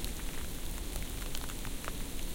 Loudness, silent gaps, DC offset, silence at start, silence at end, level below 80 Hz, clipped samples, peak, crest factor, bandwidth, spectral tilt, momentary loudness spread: -41 LUFS; none; under 0.1%; 0 s; 0 s; -40 dBFS; under 0.1%; -20 dBFS; 18 dB; 17 kHz; -3.5 dB/octave; 1 LU